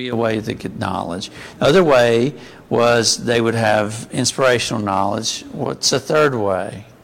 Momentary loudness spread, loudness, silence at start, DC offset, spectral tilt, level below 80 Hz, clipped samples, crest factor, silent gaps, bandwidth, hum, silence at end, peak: 12 LU; -17 LUFS; 0 s; under 0.1%; -4 dB/octave; -50 dBFS; under 0.1%; 14 dB; none; 16.5 kHz; none; 0.2 s; -4 dBFS